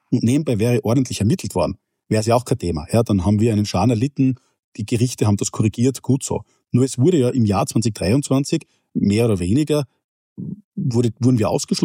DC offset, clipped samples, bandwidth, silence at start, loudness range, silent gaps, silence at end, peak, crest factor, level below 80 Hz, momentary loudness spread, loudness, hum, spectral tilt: under 0.1%; under 0.1%; 16 kHz; 0.1 s; 2 LU; 4.59-4.72 s, 10.04-10.36 s, 10.64-10.72 s; 0 s; -4 dBFS; 16 dB; -46 dBFS; 9 LU; -19 LUFS; none; -6.5 dB/octave